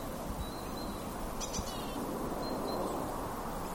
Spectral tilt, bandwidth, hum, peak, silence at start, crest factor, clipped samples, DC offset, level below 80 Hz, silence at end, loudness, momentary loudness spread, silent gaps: -4.5 dB/octave; 17 kHz; none; -24 dBFS; 0 s; 14 dB; under 0.1%; under 0.1%; -46 dBFS; 0 s; -38 LUFS; 4 LU; none